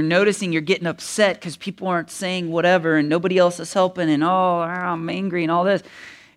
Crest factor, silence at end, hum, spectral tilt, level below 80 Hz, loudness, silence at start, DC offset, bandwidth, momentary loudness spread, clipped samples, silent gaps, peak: 16 dB; 0.2 s; none; -5 dB/octave; -66 dBFS; -20 LUFS; 0 s; under 0.1%; 14.5 kHz; 7 LU; under 0.1%; none; -4 dBFS